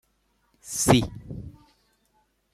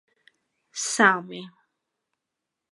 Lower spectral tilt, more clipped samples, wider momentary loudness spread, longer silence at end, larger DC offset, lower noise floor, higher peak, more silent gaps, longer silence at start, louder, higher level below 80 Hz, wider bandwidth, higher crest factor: first, -4.5 dB/octave vs -2.5 dB/octave; neither; first, 25 LU vs 20 LU; second, 1.05 s vs 1.25 s; neither; second, -69 dBFS vs -85 dBFS; about the same, -2 dBFS vs -4 dBFS; neither; about the same, 0.65 s vs 0.75 s; about the same, -23 LUFS vs -22 LUFS; first, -48 dBFS vs -84 dBFS; first, 15.5 kHz vs 11.5 kHz; about the same, 26 dB vs 24 dB